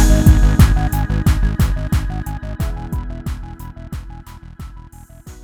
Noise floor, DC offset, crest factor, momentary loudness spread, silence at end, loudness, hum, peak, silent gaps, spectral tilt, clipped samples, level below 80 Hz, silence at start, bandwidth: -38 dBFS; under 0.1%; 16 dB; 24 LU; 0 s; -17 LUFS; none; 0 dBFS; none; -6.5 dB/octave; under 0.1%; -18 dBFS; 0 s; 18 kHz